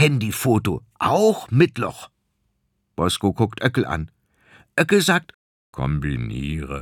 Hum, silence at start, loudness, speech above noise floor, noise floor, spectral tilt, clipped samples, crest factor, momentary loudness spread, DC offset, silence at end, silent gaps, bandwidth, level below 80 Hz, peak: none; 0 s; -21 LUFS; 50 dB; -71 dBFS; -5.5 dB/octave; under 0.1%; 20 dB; 11 LU; under 0.1%; 0 s; 5.34-5.73 s; 19.5 kHz; -42 dBFS; -2 dBFS